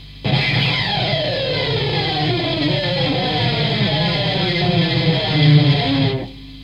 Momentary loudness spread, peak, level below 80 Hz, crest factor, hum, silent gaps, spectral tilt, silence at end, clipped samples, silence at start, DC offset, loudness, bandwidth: 5 LU; -2 dBFS; -40 dBFS; 16 dB; none; none; -7 dB/octave; 0 s; under 0.1%; 0 s; under 0.1%; -17 LUFS; 7.4 kHz